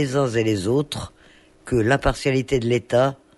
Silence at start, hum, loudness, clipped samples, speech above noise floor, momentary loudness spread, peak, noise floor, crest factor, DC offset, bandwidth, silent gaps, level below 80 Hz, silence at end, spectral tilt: 0 s; none; -21 LUFS; under 0.1%; 31 dB; 7 LU; -6 dBFS; -52 dBFS; 16 dB; under 0.1%; 11.5 kHz; none; -38 dBFS; 0.25 s; -6 dB/octave